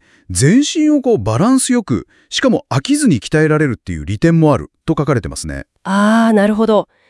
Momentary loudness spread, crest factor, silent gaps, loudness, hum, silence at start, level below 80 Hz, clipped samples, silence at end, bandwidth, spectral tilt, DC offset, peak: 10 LU; 14 dB; none; -14 LUFS; none; 0.3 s; -40 dBFS; under 0.1%; 0.25 s; 12 kHz; -5.5 dB/octave; under 0.1%; 0 dBFS